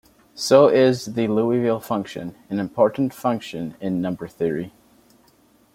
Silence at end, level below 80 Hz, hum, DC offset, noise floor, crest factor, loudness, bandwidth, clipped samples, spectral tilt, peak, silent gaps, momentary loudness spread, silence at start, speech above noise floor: 1.05 s; -60 dBFS; none; under 0.1%; -57 dBFS; 20 dB; -21 LUFS; 16.5 kHz; under 0.1%; -6 dB/octave; 0 dBFS; none; 14 LU; 0.35 s; 37 dB